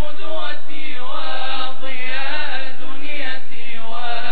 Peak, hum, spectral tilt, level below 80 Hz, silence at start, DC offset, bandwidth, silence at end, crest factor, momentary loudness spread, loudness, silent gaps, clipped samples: -4 dBFS; none; -6.5 dB/octave; -60 dBFS; 0 s; 50%; 4.8 kHz; 0 s; 16 dB; 8 LU; -28 LUFS; none; under 0.1%